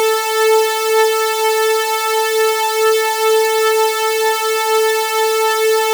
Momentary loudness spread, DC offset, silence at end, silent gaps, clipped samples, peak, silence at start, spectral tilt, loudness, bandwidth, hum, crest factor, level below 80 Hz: 2 LU; under 0.1%; 0 s; none; under 0.1%; 0 dBFS; 0 s; 3.5 dB/octave; -14 LUFS; over 20 kHz; none; 14 dB; under -90 dBFS